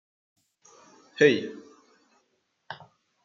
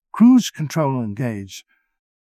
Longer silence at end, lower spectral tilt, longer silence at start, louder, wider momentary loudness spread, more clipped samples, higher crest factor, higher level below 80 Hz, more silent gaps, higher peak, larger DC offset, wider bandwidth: second, 0.5 s vs 0.75 s; second, -5 dB/octave vs -6.5 dB/octave; first, 1.2 s vs 0.15 s; second, -23 LUFS vs -18 LUFS; first, 24 LU vs 21 LU; neither; first, 24 dB vs 16 dB; second, -84 dBFS vs -58 dBFS; neither; about the same, -6 dBFS vs -4 dBFS; neither; second, 7.4 kHz vs 15 kHz